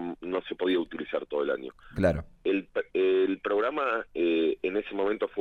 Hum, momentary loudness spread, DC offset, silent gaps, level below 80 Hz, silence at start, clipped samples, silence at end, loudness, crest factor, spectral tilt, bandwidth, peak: none; 7 LU; under 0.1%; none; -52 dBFS; 0 s; under 0.1%; 0 s; -29 LUFS; 16 dB; -7.5 dB/octave; 9 kHz; -12 dBFS